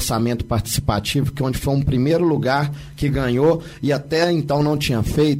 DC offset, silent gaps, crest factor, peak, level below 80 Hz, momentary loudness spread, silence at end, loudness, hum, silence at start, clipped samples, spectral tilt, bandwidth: under 0.1%; none; 14 dB; -4 dBFS; -34 dBFS; 5 LU; 0 s; -20 LUFS; none; 0 s; under 0.1%; -6 dB/octave; 16 kHz